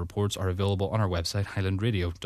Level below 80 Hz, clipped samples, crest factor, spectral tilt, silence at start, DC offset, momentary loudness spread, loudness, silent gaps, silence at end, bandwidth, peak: -46 dBFS; under 0.1%; 16 dB; -6 dB/octave; 0 s; under 0.1%; 2 LU; -28 LUFS; none; 0 s; 14 kHz; -12 dBFS